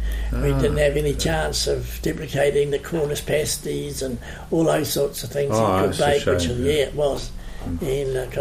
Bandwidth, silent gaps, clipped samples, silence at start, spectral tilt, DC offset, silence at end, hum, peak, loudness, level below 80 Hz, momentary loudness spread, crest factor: 15.5 kHz; none; under 0.1%; 0 s; -5 dB/octave; under 0.1%; 0 s; none; -6 dBFS; -22 LUFS; -32 dBFS; 8 LU; 16 dB